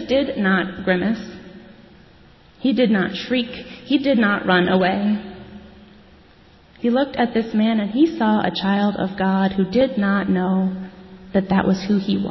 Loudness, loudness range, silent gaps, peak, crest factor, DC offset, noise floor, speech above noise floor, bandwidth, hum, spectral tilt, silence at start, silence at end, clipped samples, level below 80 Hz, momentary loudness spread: -20 LUFS; 3 LU; none; -4 dBFS; 16 dB; under 0.1%; -49 dBFS; 31 dB; 6 kHz; none; -7.5 dB/octave; 0 s; 0 s; under 0.1%; -50 dBFS; 9 LU